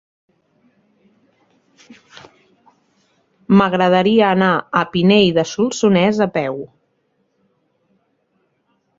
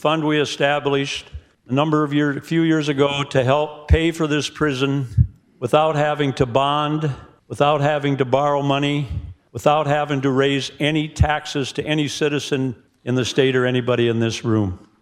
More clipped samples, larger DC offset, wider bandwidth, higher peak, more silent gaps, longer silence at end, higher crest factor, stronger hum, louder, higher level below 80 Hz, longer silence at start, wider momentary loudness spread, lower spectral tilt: neither; neither; second, 7.8 kHz vs 13 kHz; about the same, -2 dBFS vs -2 dBFS; neither; first, 2.3 s vs 0.25 s; about the same, 18 dB vs 18 dB; neither; first, -15 LUFS vs -20 LUFS; second, -56 dBFS vs -36 dBFS; first, 1.9 s vs 0.05 s; about the same, 8 LU vs 7 LU; about the same, -6 dB/octave vs -6 dB/octave